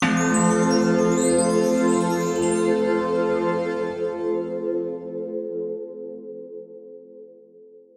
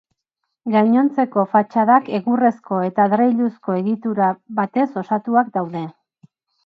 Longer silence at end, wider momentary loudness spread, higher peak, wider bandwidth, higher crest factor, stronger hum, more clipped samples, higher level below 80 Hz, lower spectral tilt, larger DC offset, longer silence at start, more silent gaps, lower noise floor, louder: second, 0.15 s vs 0.75 s; first, 18 LU vs 8 LU; second, -6 dBFS vs -2 dBFS; first, 14 kHz vs 4.9 kHz; about the same, 16 dB vs 16 dB; neither; neither; first, -60 dBFS vs -72 dBFS; second, -5 dB/octave vs -9.5 dB/octave; neither; second, 0 s vs 0.65 s; neither; second, -49 dBFS vs -78 dBFS; second, -22 LUFS vs -18 LUFS